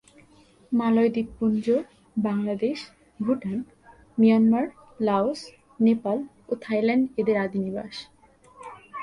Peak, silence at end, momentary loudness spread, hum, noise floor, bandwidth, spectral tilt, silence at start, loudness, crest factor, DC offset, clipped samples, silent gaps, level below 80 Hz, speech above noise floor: -8 dBFS; 0 s; 17 LU; none; -56 dBFS; 10.5 kHz; -7.5 dB/octave; 0.7 s; -25 LUFS; 16 dB; under 0.1%; under 0.1%; none; -62 dBFS; 32 dB